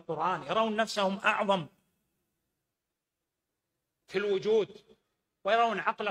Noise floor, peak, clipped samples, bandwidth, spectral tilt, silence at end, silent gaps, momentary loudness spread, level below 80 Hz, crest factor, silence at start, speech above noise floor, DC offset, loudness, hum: -87 dBFS; -12 dBFS; under 0.1%; 13 kHz; -4.5 dB/octave; 0 s; none; 9 LU; -74 dBFS; 20 dB; 0.1 s; 58 dB; under 0.1%; -30 LUFS; none